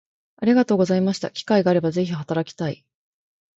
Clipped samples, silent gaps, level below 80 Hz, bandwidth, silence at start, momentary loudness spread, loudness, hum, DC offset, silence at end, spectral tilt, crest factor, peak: under 0.1%; none; -64 dBFS; 8 kHz; 0.4 s; 11 LU; -21 LUFS; none; under 0.1%; 0.85 s; -7 dB/octave; 18 dB; -4 dBFS